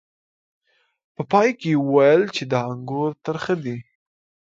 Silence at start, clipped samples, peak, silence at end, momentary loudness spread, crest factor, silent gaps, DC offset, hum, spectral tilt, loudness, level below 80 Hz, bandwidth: 1.2 s; under 0.1%; -2 dBFS; 0.65 s; 13 LU; 20 dB; none; under 0.1%; none; -6.5 dB/octave; -20 LUFS; -66 dBFS; 7.8 kHz